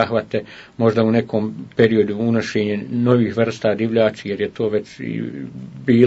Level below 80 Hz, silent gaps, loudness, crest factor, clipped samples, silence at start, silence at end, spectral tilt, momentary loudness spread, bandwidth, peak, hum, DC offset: -58 dBFS; none; -19 LUFS; 18 dB; under 0.1%; 0 s; 0 s; -7.5 dB/octave; 11 LU; 8 kHz; 0 dBFS; none; under 0.1%